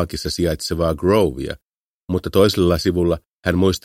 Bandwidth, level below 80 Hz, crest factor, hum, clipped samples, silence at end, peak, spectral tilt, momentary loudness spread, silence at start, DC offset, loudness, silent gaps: 16.5 kHz; -36 dBFS; 18 dB; none; under 0.1%; 0.05 s; -2 dBFS; -6 dB/octave; 9 LU; 0 s; under 0.1%; -19 LUFS; 1.62-2.01 s, 3.26-3.38 s